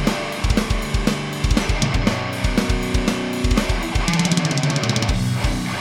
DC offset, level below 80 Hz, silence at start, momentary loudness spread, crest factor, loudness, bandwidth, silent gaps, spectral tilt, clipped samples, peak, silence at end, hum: under 0.1%; -26 dBFS; 0 s; 4 LU; 16 dB; -20 LUFS; 17 kHz; none; -5 dB/octave; under 0.1%; -2 dBFS; 0 s; none